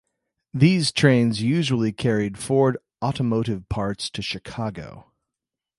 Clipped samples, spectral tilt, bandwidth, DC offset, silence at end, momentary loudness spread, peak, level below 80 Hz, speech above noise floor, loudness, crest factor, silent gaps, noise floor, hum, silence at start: under 0.1%; -6 dB/octave; 11.5 kHz; under 0.1%; 0.8 s; 12 LU; -2 dBFS; -48 dBFS; 65 dB; -22 LUFS; 20 dB; none; -86 dBFS; none; 0.55 s